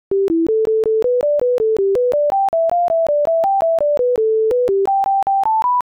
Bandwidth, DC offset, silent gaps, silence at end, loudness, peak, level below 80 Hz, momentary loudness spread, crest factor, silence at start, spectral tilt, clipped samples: 11.5 kHz; under 0.1%; none; 0.05 s; -16 LUFS; -12 dBFS; -52 dBFS; 1 LU; 4 dB; 0.1 s; -7 dB/octave; under 0.1%